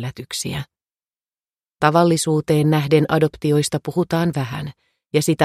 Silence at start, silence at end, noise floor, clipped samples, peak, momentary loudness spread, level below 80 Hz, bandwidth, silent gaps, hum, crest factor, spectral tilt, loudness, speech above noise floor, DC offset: 0 s; 0 s; under -90 dBFS; under 0.1%; 0 dBFS; 11 LU; -52 dBFS; 15 kHz; 1.16-1.20 s; none; 20 dB; -5.5 dB/octave; -19 LUFS; over 72 dB; under 0.1%